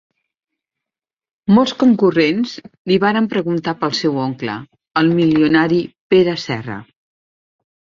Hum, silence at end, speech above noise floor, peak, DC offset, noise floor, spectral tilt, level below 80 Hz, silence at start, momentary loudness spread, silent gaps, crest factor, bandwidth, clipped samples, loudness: none; 1.1 s; 73 dB; -2 dBFS; under 0.1%; -88 dBFS; -6.5 dB/octave; -56 dBFS; 1.45 s; 12 LU; 2.78-2.85 s, 6.00-6.10 s; 16 dB; 7.4 kHz; under 0.1%; -16 LUFS